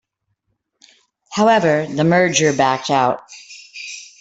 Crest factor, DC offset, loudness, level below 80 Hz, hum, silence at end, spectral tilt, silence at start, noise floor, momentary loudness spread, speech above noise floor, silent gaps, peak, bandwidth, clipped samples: 18 dB; under 0.1%; -16 LUFS; -58 dBFS; none; 0.15 s; -4.5 dB/octave; 1.3 s; -71 dBFS; 19 LU; 56 dB; none; -2 dBFS; 8.4 kHz; under 0.1%